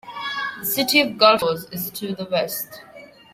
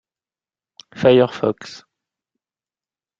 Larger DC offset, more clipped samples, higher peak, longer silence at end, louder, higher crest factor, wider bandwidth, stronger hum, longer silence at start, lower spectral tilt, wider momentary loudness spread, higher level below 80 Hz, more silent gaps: neither; neither; about the same, -2 dBFS vs -2 dBFS; second, 0.3 s vs 1.45 s; second, -20 LUFS vs -17 LUFS; about the same, 20 dB vs 20 dB; first, 16.5 kHz vs 7.6 kHz; neither; second, 0.05 s vs 0.95 s; second, -3 dB/octave vs -6.5 dB/octave; second, 14 LU vs 19 LU; about the same, -62 dBFS vs -58 dBFS; neither